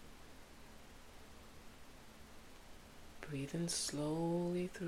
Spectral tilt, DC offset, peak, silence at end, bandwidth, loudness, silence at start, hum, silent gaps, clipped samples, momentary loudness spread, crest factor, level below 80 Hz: -4.5 dB/octave; under 0.1%; -28 dBFS; 0 s; 16 kHz; -40 LUFS; 0 s; none; none; under 0.1%; 21 LU; 16 dB; -62 dBFS